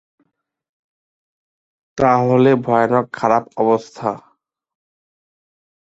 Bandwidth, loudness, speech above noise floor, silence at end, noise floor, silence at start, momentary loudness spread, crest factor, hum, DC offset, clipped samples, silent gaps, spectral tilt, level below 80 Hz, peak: 8 kHz; -16 LUFS; 51 dB; 1.75 s; -67 dBFS; 1.95 s; 11 LU; 18 dB; none; under 0.1%; under 0.1%; none; -7.5 dB/octave; -56 dBFS; -2 dBFS